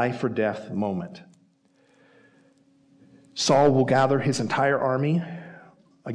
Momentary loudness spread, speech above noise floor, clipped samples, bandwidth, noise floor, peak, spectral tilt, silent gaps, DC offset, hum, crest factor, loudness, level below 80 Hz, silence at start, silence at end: 20 LU; 40 dB; under 0.1%; 10.5 kHz; -63 dBFS; -10 dBFS; -5.5 dB/octave; none; under 0.1%; none; 16 dB; -23 LUFS; -62 dBFS; 0 s; 0 s